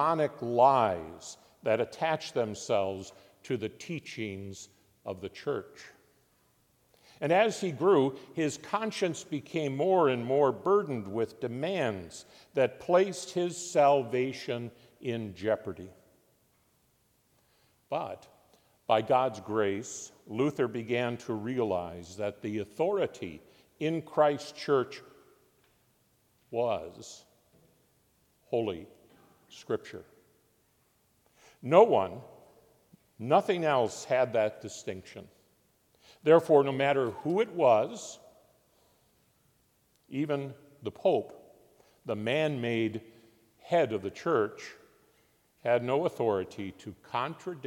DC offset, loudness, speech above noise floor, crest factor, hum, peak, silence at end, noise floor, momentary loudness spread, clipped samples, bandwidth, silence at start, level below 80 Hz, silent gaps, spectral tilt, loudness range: under 0.1%; -30 LUFS; 41 dB; 24 dB; none; -6 dBFS; 0 s; -70 dBFS; 19 LU; under 0.1%; 16.5 kHz; 0 s; -76 dBFS; none; -5.5 dB/octave; 11 LU